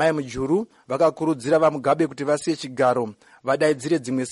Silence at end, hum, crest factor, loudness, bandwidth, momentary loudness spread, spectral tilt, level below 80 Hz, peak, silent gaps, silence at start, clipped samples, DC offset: 0 s; none; 14 dB; -22 LUFS; 11.5 kHz; 7 LU; -5.5 dB/octave; -56 dBFS; -8 dBFS; none; 0 s; under 0.1%; under 0.1%